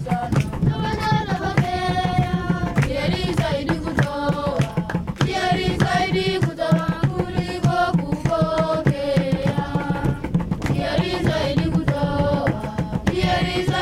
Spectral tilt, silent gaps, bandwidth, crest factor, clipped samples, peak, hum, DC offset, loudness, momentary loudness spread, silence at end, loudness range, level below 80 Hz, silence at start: -6.5 dB/octave; none; 13.5 kHz; 18 dB; under 0.1%; -4 dBFS; none; under 0.1%; -21 LUFS; 3 LU; 0 s; 1 LU; -36 dBFS; 0 s